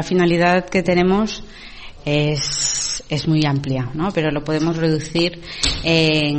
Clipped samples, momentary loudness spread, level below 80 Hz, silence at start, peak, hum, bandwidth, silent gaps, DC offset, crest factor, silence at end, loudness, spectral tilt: under 0.1%; 9 LU; -38 dBFS; 0 s; -2 dBFS; none; 8.8 kHz; none; under 0.1%; 16 dB; 0 s; -18 LUFS; -4.5 dB/octave